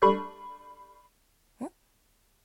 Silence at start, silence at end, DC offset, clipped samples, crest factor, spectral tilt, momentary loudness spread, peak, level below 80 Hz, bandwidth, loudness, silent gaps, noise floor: 0 s; 0.75 s; under 0.1%; under 0.1%; 22 dB; -6.5 dB/octave; 23 LU; -10 dBFS; -64 dBFS; 16 kHz; -33 LUFS; none; -68 dBFS